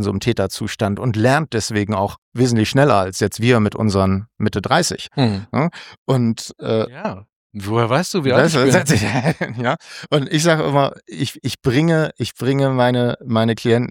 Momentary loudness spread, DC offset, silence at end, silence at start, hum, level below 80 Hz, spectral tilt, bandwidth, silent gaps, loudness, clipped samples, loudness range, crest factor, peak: 9 LU; under 0.1%; 0 s; 0 s; none; -50 dBFS; -5.5 dB/octave; 17 kHz; 2.18-2.32 s, 5.98-6.06 s, 7.36-7.50 s; -18 LUFS; under 0.1%; 3 LU; 16 dB; 0 dBFS